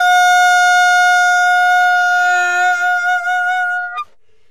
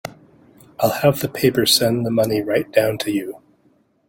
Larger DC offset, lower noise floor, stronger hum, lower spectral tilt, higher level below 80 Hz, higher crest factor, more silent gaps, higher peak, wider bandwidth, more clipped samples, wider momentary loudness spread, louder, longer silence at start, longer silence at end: first, 0.7% vs under 0.1%; second, -33 dBFS vs -59 dBFS; neither; second, 2.5 dB/octave vs -4.5 dB/octave; second, -64 dBFS vs -54 dBFS; second, 10 dB vs 18 dB; neither; about the same, -2 dBFS vs -2 dBFS; about the same, 15.5 kHz vs 17 kHz; neither; about the same, 9 LU vs 9 LU; first, -12 LUFS vs -18 LUFS; about the same, 0 s vs 0.05 s; second, 0.45 s vs 0.7 s